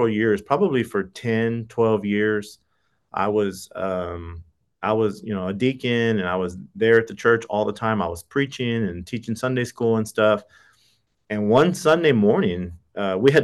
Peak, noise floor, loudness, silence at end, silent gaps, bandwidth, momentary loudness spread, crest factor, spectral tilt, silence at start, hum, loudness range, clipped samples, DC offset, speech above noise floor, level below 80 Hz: -4 dBFS; -68 dBFS; -22 LUFS; 0 s; none; 12.5 kHz; 12 LU; 16 dB; -6.5 dB/octave; 0 s; none; 5 LU; under 0.1%; under 0.1%; 47 dB; -58 dBFS